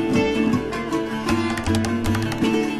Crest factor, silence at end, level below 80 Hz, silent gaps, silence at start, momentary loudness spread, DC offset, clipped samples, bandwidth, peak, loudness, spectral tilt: 14 dB; 0 s; -40 dBFS; none; 0 s; 4 LU; under 0.1%; under 0.1%; 13.5 kHz; -6 dBFS; -22 LUFS; -5.5 dB/octave